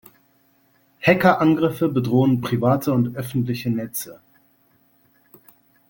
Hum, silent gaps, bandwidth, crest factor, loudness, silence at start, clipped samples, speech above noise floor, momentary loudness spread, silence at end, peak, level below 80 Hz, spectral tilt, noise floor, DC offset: none; none; 17 kHz; 20 dB; -20 LUFS; 1 s; under 0.1%; 41 dB; 10 LU; 1.75 s; -2 dBFS; -60 dBFS; -7 dB/octave; -61 dBFS; under 0.1%